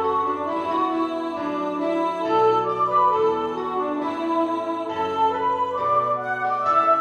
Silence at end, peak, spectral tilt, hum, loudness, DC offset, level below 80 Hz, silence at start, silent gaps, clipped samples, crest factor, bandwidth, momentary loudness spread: 0 s; -8 dBFS; -6 dB/octave; none; -22 LUFS; under 0.1%; -64 dBFS; 0 s; none; under 0.1%; 14 dB; 9.4 kHz; 7 LU